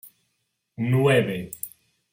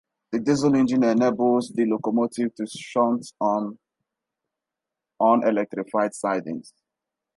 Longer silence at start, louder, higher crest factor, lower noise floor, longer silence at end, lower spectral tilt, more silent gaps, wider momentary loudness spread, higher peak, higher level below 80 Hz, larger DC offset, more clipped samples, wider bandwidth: second, 0.05 s vs 0.3 s; about the same, -23 LUFS vs -23 LUFS; about the same, 18 dB vs 18 dB; second, -75 dBFS vs -87 dBFS; second, 0.45 s vs 0.75 s; about the same, -6 dB/octave vs -6 dB/octave; neither; first, 16 LU vs 9 LU; about the same, -8 dBFS vs -6 dBFS; first, -62 dBFS vs -68 dBFS; neither; neither; first, 16.5 kHz vs 11.5 kHz